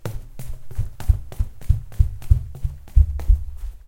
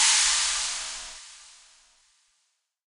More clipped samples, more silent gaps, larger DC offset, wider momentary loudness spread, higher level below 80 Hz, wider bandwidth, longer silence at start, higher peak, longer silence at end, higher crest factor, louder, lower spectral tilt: neither; neither; neither; second, 15 LU vs 23 LU; first, -22 dBFS vs -58 dBFS; about the same, 16.5 kHz vs 16 kHz; about the same, 0.05 s vs 0 s; first, 0 dBFS vs -8 dBFS; second, 0.1 s vs 1.5 s; about the same, 20 dB vs 22 dB; about the same, -24 LUFS vs -23 LUFS; first, -7.5 dB/octave vs 4.5 dB/octave